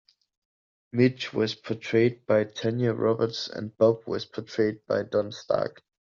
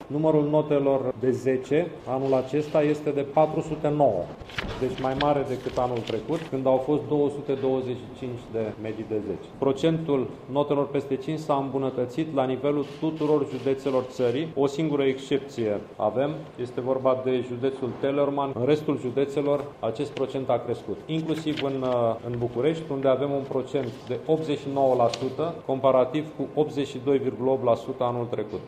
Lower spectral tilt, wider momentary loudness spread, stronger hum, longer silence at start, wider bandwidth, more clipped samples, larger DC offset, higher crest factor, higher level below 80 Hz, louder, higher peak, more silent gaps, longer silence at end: second, -5.5 dB/octave vs -7.5 dB/octave; about the same, 9 LU vs 7 LU; neither; first, 0.95 s vs 0 s; second, 7.4 kHz vs 10.5 kHz; neither; neither; about the same, 18 dB vs 18 dB; second, -68 dBFS vs -56 dBFS; about the same, -27 LUFS vs -26 LUFS; about the same, -8 dBFS vs -8 dBFS; neither; first, 0.45 s vs 0 s